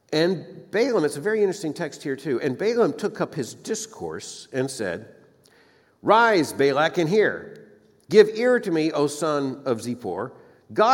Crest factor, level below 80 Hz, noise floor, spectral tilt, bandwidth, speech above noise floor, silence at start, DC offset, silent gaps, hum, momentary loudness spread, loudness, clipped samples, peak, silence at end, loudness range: 22 dB; -72 dBFS; -58 dBFS; -5 dB/octave; 16.5 kHz; 35 dB; 0.1 s; under 0.1%; none; none; 14 LU; -23 LUFS; under 0.1%; -2 dBFS; 0 s; 6 LU